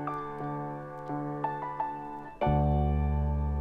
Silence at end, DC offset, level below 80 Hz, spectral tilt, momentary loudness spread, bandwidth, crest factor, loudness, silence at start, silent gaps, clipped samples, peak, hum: 0 s; under 0.1%; -36 dBFS; -10 dB/octave; 11 LU; 3.8 kHz; 14 dB; -32 LUFS; 0 s; none; under 0.1%; -16 dBFS; none